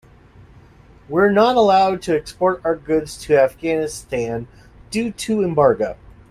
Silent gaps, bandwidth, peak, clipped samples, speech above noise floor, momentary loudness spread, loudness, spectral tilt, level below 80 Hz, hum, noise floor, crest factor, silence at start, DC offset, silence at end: none; 15 kHz; -2 dBFS; under 0.1%; 29 dB; 11 LU; -18 LUFS; -5.5 dB/octave; -48 dBFS; none; -47 dBFS; 18 dB; 1.1 s; under 0.1%; 0.35 s